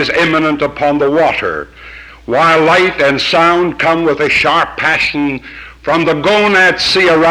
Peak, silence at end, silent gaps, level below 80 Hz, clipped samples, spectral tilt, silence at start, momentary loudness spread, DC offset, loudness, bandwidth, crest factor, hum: 0 dBFS; 0 s; none; -40 dBFS; under 0.1%; -4.5 dB/octave; 0 s; 15 LU; under 0.1%; -11 LUFS; 15 kHz; 12 dB; none